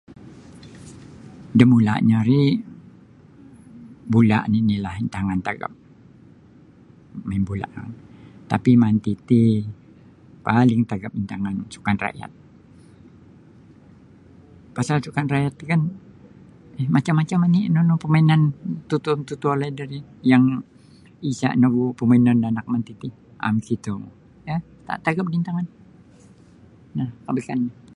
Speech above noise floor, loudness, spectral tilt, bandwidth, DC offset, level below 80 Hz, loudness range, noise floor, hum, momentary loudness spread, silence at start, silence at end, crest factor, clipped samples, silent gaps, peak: 30 dB; -21 LUFS; -8 dB/octave; 10.5 kHz; under 0.1%; -52 dBFS; 9 LU; -49 dBFS; none; 19 LU; 0.1 s; 0.25 s; 22 dB; under 0.1%; none; 0 dBFS